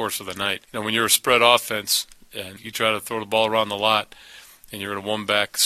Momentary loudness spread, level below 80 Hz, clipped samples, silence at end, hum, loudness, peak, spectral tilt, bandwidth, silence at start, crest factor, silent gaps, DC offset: 18 LU; -60 dBFS; under 0.1%; 0 s; none; -21 LUFS; 0 dBFS; -1.5 dB/octave; 14.5 kHz; 0 s; 22 dB; none; under 0.1%